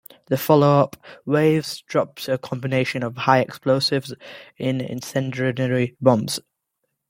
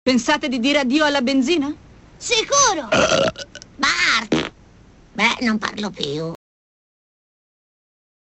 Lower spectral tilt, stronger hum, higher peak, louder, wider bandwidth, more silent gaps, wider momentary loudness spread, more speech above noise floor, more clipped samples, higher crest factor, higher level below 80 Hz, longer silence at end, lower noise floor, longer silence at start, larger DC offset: first, -6 dB/octave vs -2.5 dB/octave; neither; about the same, -2 dBFS vs -2 dBFS; second, -21 LUFS vs -18 LUFS; first, 16.5 kHz vs 8.2 kHz; neither; second, 10 LU vs 16 LU; first, 56 dB vs 29 dB; neither; about the same, 20 dB vs 18 dB; second, -62 dBFS vs -50 dBFS; second, 0.7 s vs 2 s; first, -76 dBFS vs -48 dBFS; first, 0.3 s vs 0.05 s; neither